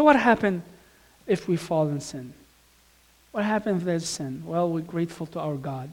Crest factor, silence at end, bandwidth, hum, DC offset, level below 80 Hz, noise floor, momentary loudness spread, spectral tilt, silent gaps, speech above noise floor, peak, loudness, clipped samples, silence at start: 22 dB; 0 s; 18 kHz; none; under 0.1%; -60 dBFS; -59 dBFS; 13 LU; -6 dB/octave; none; 34 dB; -4 dBFS; -26 LUFS; under 0.1%; 0 s